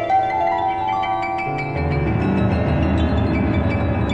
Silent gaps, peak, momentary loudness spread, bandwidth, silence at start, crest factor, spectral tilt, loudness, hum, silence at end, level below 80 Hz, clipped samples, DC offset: none; -6 dBFS; 3 LU; 8 kHz; 0 s; 12 dB; -8.5 dB/octave; -20 LUFS; none; 0 s; -30 dBFS; under 0.1%; under 0.1%